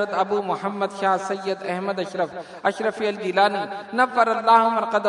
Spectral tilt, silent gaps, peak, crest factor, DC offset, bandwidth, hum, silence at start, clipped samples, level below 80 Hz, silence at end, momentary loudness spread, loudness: -5 dB/octave; none; -2 dBFS; 20 dB; under 0.1%; 11 kHz; none; 0 s; under 0.1%; -74 dBFS; 0 s; 10 LU; -22 LUFS